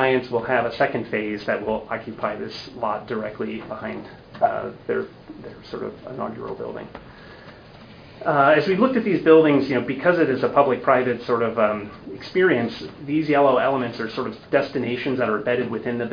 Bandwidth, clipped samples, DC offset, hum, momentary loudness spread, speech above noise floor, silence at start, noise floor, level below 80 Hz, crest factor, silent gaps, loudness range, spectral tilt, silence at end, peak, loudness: 5.2 kHz; under 0.1%; under 0.1%; none; 16 LU; 22 dB; 0 s; -44 dBFS; -56 dBFS; 20 dB; none; 11 LU; -8 dB/octave; 0 s; -2 dBFS; -22 LUFS